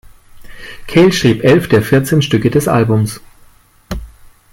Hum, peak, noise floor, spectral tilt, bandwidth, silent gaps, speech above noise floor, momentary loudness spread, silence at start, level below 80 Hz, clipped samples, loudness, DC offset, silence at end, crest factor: none; 0 dBFS; -46 dBFS; -6 dB/octave; 17 kHz; none; 35 dB; 18 LU; 0.35 s; -36 dBFS; under 0.1%; -12 LUFS; under 0.1%; 0.45 s; 12 dB